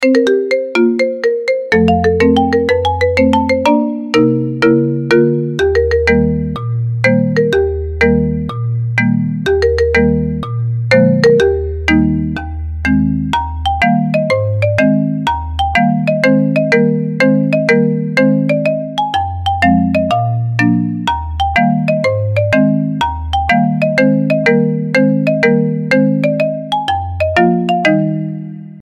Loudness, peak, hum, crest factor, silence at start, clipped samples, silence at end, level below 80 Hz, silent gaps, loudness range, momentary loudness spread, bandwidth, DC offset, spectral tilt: -13 LUFS; 0 dBFS; none; 12 dB; 0 s; under 0.1%; 0 s; -30 dBFS; none; 2 LU; 6 LU; 11.5 kHz; under 0.1%; -7.5 dB/octave